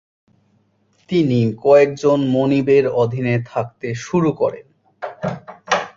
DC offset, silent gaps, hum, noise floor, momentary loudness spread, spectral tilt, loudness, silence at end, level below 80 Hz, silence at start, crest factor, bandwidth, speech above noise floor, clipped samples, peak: under 0.1%; none; none; -60 dBFS; 14 LU; -7 dB/octave; -18 LUFS; 0.1 s; -56 dBFS; 1.1 s; 16 dB; 7.6 kHz; 44 dB; under 0.1%; -2 dBFS